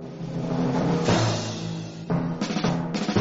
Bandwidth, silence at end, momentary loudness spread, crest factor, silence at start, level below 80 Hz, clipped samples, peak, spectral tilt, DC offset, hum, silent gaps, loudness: 8 kHz; 0 s; 10 LU; 18 dB; 0 s; -50 dBFS; under 0.1%; -8 dBFS; -5.5 dB/octave; under 0.1%; none; none; -26 LUFS